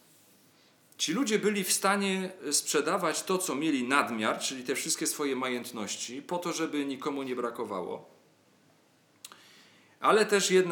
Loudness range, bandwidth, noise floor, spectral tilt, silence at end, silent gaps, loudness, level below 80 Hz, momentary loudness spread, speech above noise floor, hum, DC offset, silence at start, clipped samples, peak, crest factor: 8 LU; 19 kHz; -65 dBFS; -3 dB/octave; 0 s; none; -29 LUFS; under -90 dBFS; 11 LU; 35 dB; none; under 0.1%; 1 s; under 0.1%; -8 dBFS; 22 dB